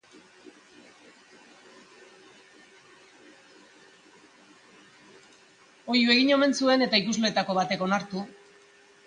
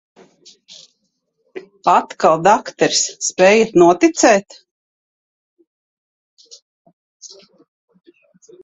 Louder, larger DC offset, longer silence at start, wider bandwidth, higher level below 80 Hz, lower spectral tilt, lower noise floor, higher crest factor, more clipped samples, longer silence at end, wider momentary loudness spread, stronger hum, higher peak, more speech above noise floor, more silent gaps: second, -24 LUFS vs -14 LUFS; neither; second, 0.45 s vs 1.55 s; first, 10 kHz vs 8.4 kHz; second, -76 dBFS vs -62 dBFS; about the same, -4 dB/octave vs -3.5 dB/octave; second, -57 dBFS vs -69 dBFS; about the same, 22 dB vs 18 dB; neither; second, 0.75 s vs 1.35 s; first, 16 LU vs 10 LU; neither; second, -8 dBFS vs 0 dBFS; second, 33 dB vs 56 dB; second, none vs 4.71-5.57 s, 5.67-6.37 s, 6.62-6.85 s, 6.93-7.20 s